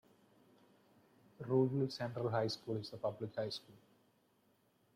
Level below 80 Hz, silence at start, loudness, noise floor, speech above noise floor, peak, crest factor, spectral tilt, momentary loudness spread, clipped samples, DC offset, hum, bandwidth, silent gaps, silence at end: -80 dBFS; 1.4 s; -39 LUFS; -75 dBFS; 36 dB; -22 dBFS; 20 dB; -7 dB/octave; 9 LU; under 0.1%; under 0.1%; none; 14.5 kHz; none; 1.2 s